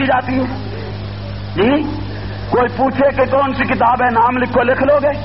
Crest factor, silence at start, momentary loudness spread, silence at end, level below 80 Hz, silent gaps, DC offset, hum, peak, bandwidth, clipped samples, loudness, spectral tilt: 12 dB; 0 s; 13 LU; 0 s; -36 dBFS; none; 1%; 50 Hz at -30 dBFS; -2 dBFS; 5.8 kHz; under 0.1%; -15 LUFS; -5 dB/octave